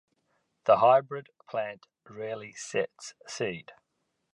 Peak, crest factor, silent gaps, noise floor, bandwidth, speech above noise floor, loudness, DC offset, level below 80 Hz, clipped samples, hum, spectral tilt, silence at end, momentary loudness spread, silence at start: -8 dBFS; 22 dB; none; -79 dBFS; 11 kHz; 51 dB; -28 LUFS; under 0.1%; -74 dBFS; under 0.1%; none; -4 dB/octave; 0.65 s; 19 LU; 0.65 s